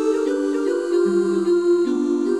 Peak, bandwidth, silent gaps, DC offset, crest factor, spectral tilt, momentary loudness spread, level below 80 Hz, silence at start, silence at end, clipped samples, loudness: -8 dBFS; 11 kHz; none; 0.2%; 10 dB; -6 dB/octave; 3 LU; -70 dBFS; 0 s; 0 s; under 0.1%; -20 LUFS